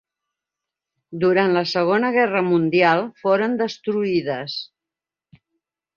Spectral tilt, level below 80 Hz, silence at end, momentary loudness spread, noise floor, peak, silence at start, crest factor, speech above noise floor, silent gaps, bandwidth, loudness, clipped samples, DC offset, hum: -6.5 dB/octave; -66 dBFS; 1.3 s; 11 LU; -88 dBFS; -2 dBFS; 1.1 s; 20 dB; 69 dB; none; 7 kHz; -20 LUFS; under 0.1%; under 0.1%; none